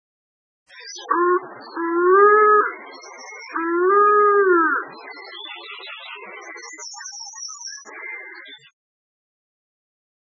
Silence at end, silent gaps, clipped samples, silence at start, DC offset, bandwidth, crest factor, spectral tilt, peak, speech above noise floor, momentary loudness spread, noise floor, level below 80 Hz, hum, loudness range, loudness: 1.8 s; none; under 0.1%; 0.8 s; under 0.1%; 7.6 kHz; 18 dB; -1.5 dB/octave; -4 dBFS; 21 dB; 22 LU; -41 dBFS; under -90 dBFS; none; 18 LU; -17 LUFS